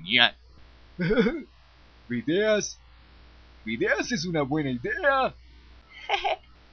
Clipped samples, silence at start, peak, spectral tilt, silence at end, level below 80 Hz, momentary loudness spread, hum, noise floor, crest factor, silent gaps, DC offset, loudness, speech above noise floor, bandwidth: under 0.1%; 0 s; -4 dBFS; -4 dB/octave; 0.35 s; -52 dBFS; 12 LU; none; -54 dBFS; 24 dB; none; under 0.1%; -26 LUFS; 29 dB; 7 kHz